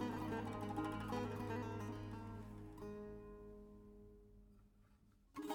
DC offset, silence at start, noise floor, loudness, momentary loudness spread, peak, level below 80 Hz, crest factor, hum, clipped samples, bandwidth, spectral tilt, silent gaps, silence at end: under 0.1%; 0 s; -70 dBFS; -47 LUFS; 18 LU; -32 dBFS; -62 dBFS; 16 dB; none; under 0.1%; 18 kHz; -7 dB/octave; none; 0 s